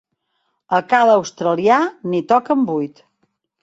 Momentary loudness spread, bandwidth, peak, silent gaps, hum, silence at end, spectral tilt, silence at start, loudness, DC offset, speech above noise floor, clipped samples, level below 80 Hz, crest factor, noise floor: 9 LU; 8 kHz; -2 dBFS; none; none; 0.75 s; -5.5 dB/octave; 0.7 s; -17 LUFS; under 0.1%; 54 dB; under 0.1%; -66 dBFS; 16 dB; -70 dBFS